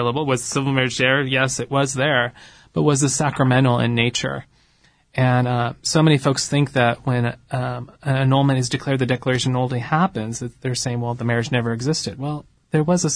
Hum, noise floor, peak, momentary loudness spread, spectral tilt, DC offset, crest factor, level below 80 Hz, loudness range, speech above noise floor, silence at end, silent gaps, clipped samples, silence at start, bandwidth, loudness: none; -58 dBFS; -4 dBFS; 10 LU; -5 dB/octave; under 0.1%; 16 dB; -52 dBFS; 3 LU; 38 dB; 0 s; none; under 0.1%; 0 s; 10.5 kHz; -20 LUFS